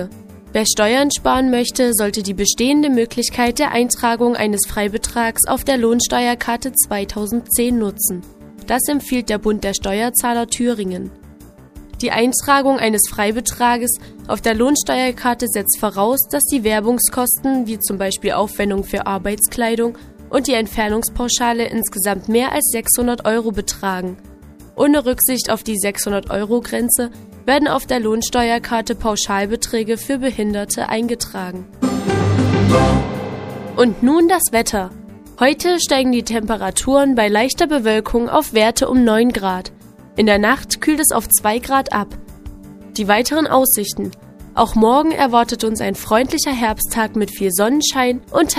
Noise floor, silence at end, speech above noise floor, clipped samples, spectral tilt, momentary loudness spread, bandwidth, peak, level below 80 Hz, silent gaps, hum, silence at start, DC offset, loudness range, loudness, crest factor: -41 dBFS; 0 s; 25 dB; under 0.1%; -3.5 dB/octave; 8 LU; 15.5 kHz; 0 dBFS; -38 dBFS; none; none; 0 s; under 0.1%; 3 LU; -16 LUFS; 16 dB